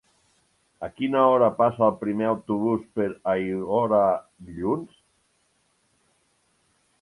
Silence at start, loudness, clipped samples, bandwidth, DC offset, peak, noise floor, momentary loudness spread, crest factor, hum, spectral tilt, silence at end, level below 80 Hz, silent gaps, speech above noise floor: 0.8 s; -24 LUFS; under 0.1%; 11.5 kHz; under 0.1%; -6 dBFS; -68 dBFS; 12 LU; 20 dB; none; -8.5 dB/octave; 2.15 s; -60 dBFS; none; 45 dB